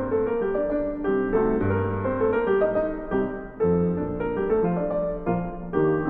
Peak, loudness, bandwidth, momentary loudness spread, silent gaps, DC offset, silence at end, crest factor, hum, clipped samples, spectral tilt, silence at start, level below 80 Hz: -8 dBFS; -25 LUFS; 3.9 kHz; 5 LU; none; under 0.1%; 0 s; 14 dB; none; under 0.1%; -11.5 dB/octave; 0 s; -42 dBFS